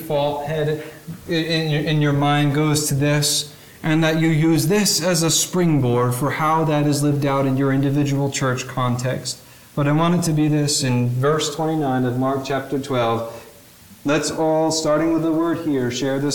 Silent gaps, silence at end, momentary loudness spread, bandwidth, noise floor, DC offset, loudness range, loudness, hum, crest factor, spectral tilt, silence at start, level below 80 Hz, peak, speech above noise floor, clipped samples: none; 0 s; 7 LU; 19 kHz; -45 dBFS; 0.3%; 4 LU; -19 LUFS; none; 14 dB; -5 dB/octave; 0 s; -50 dBFS; -6 dBFS; 26 dB; under 0.1%